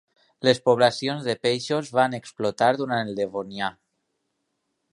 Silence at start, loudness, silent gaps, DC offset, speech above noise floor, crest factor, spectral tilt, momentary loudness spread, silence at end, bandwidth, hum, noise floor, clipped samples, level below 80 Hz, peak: 0.4 s; -24 LUFS; none; under 0.1%; 53 dB; 22 dB; -5 dB/octave; 9 LU; 1.2 s; 11.5 kHz; none; -76 dBFS; under 0.1%; -68 dBFS; -4 dBFS